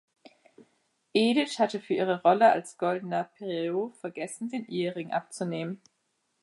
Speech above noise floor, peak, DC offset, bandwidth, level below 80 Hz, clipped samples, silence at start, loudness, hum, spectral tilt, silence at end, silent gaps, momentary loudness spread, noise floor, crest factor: 49 dB; -8 dBFS; under 0.1%; 11.5 kHz; -82 dBFS; under 0.1%; 1.15 s; -28 LUFS; none; -5 dB/octave; 0.65 s; none; 13 LU; -76 dBFS; 20 dB